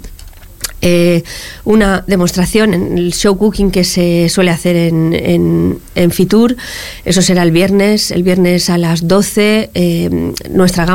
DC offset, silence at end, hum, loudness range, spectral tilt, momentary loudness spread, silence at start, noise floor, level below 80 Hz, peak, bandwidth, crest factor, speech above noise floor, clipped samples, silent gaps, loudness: 1%; 0 s; none; 1 LU; -5.5 dB/octave; 6 LU; 0 s; -32 dBFS; -30 dBFS; 0 dBFS; 17 kHz; 10 dB; 21 dB; under 0.1%; none; -11 LUFS